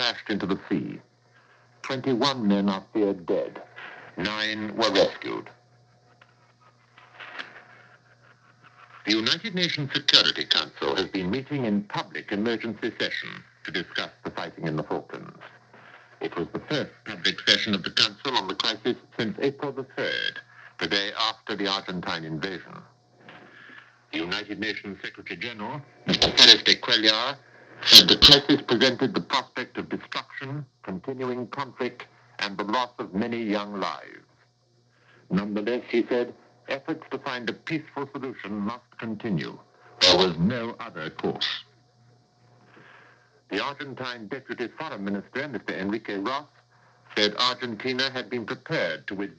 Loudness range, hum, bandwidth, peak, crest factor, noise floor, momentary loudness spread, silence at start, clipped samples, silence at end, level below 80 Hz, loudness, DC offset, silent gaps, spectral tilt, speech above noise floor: 16 LU; none; 11 kHz; 0 dBFS; 26 dB; -64 dBFS; 17 LU; 0 s; under 0.1%; 0.05 s; -56 dBFS; -24 LUFS; under 0.1%; none; -3.5 dB/octave; 38 dB